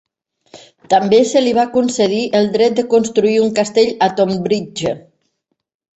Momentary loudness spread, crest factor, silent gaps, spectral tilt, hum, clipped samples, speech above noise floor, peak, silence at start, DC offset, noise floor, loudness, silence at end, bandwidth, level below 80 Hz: 7 LU; 14 dB; none; -5 dB/octave; none; under 0.1%; 57 dB; -2 dBFS; 0.55 s; under 0.1%; -71 dBFS; -15 LUFS; 0.95 s; 8.2 kHz; -56 dBFS